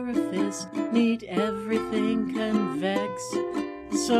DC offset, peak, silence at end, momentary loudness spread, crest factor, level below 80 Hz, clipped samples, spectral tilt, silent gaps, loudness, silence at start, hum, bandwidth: under 0.1%; -10 dBFS; 0 s; 6 LU; 16 dB; -58 dBFS; under 0.1%; -5 dB/octave; none; -27 LUFS; 0 s; none; 14 kHz